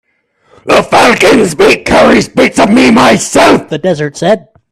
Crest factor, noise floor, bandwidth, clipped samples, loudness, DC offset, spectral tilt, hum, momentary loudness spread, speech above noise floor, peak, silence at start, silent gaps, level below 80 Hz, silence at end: 8 dB; -53 dBFS; 15 kHz; 0.6%; -7 LUFS; under 0.1%; -4 dB/octave; none; 8 LU; 46 dB; 0 dBFS; 0.65 s; none; -36 dBFS; 0.35 s